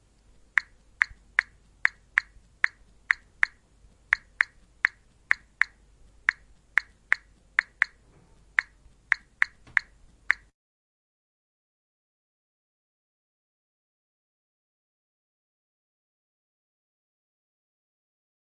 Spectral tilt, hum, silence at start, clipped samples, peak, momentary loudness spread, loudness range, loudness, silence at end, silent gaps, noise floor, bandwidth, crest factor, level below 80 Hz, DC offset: 0 dB/octave; none; 0.55 s; under 0.1%; -2 dBFS; 3 LU; 4 LU; -28 LUFS; 8.2 s; none; -59 dBFS; 11 kHz; 32 dB; -62 dBFS; under 0.1%